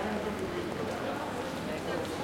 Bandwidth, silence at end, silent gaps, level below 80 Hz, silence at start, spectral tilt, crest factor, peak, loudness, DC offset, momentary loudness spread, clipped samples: 16.5 kHz; 0 s; none; -58 dBFS; 0 s; -5 dB/octave; 14 dB; -20 dBFS; -35 LUFS; under 0.1%; 2 LU; under 0.1%